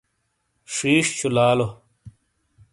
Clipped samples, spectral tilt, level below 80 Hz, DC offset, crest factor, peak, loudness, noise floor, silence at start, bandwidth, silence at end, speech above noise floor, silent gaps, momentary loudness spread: under 0.1%; -4 dB/octave; -58 dBFS; under 0.1%; 18 dB; -6 dBFS; -21 LUFS; -72 dBFS; 0.7 s; 11.5 kHz; 0.65 s; 52 dB; none; 10 LU